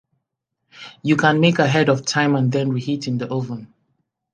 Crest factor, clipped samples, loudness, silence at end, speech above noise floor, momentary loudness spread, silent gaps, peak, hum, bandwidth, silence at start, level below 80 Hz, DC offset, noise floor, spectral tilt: 20 dB; under 0.1%; -19 LUFS; 0.7 s; 60 dB; 15 LU; none; 0 dBFS; none; 9.8 kHz; 0.75 s; -64 dBFS; under 0.1%; -78 dBFS; -5.5 dB/octave